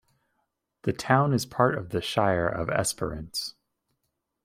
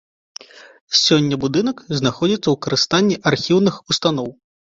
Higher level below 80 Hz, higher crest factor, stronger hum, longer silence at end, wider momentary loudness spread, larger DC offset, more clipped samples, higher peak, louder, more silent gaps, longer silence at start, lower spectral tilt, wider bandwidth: about the same, -54 dBFS vs -54 dBFS; about the same, 22 dB vs 18 dB; neither; first, 0.95 s vs 0.45 s; about the same, 10 LU vs 11 LU; neither; neither; second, -6 dBFS vs -2 dBFS; second, -27 LUFS vs -17 LUFS; second, none vs 0.81-0.88 s; first, 0.85 s vs 0.55 s; about the same, -5 dB/octave vs -4.5 dB/octave; first, 16 kHz vs 7.8 kHz